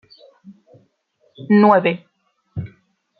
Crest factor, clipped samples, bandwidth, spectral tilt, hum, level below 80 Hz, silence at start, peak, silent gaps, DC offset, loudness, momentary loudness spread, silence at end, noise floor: 18 dB; under 0.1%; 4.9 kHz; -10 dB/octave; none; -60 dBFS; 1.4 s; -2 dBFS; none; under 0.1%; -15 LUFS; 24 LU; 0.55 s; -63 dBFS